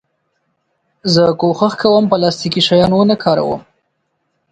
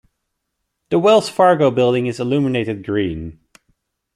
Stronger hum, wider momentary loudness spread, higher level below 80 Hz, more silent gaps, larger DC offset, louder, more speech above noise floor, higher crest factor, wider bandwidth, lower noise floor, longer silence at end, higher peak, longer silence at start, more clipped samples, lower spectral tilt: neither; second, 7 LU vs 10 LU; about the same, -50 dBFS vs -50 dBFS; neither; neither; first, -13 LUFS vs -17 LUFS; second, 55 dB vs 59 dB; about the same, 14 dB vs 16 dB; second, 9.2 kHz vs 13.5 kHz; second, -68 dBFS vs -75 dBFS; about the same, 0.9 s vs 0.85 s; about the same, 0 dBFS vs -2 dBFS; first, 1.05 s vs 0.9 s; neither; about the same, -6 dB/octave vs -6.5 dB/octave